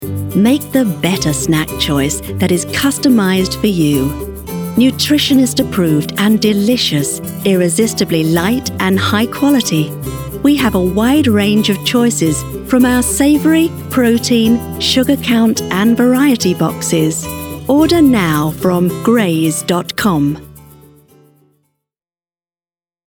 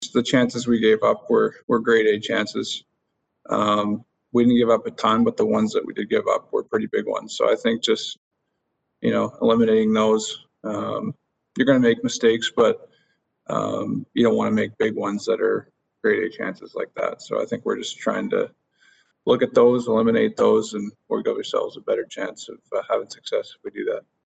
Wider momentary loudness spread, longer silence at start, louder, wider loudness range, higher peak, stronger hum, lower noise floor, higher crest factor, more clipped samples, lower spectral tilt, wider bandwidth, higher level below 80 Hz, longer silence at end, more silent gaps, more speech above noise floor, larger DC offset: second, 6 LU vs 12 LU; about the same, 0 s vs 0 s; first, -13 LUFS vs -22 LUFS; about the same, 2 LU vs 4 LU; first, 0 dBFS vs -4 dBFS; neither; first, under -90 dBFS vs -75 dBFS; second, 12 dB vs 18 dB; neither; about the same, -4.5 dB/octave vs -5 dB/octave; first, over 20 kHz vs 8.8 kHz; first, -36 dBFS vs -60 dBFS; first, 2.5 s vs 0.25 s; second, none vs 1.63-1.68 s, 8.17-8.31 s; first, over 78 dB vs 54 dB; neither